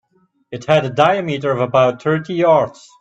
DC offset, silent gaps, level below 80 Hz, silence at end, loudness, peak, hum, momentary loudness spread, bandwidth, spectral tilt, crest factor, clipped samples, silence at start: under 0.1%; none; -58 dBFS; 0.3 s; -16 LUFS; 0 dBFS; none; 9 LU; 8 kHz; -6.5 dB/octave; 16 dB; under 0.1%; 0.5 s